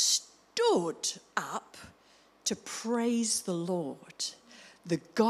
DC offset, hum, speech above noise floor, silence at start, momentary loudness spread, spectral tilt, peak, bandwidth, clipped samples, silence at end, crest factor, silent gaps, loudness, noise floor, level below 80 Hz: under 0.1%; none; 31 dB; 0 s; 17 LU; -3 dB/octave; -12 dBFS; 15.5 kHz; under 0.1%; 0 s; 20 dB; none; -32 LUFS; -62 dBFS; -76 dBFS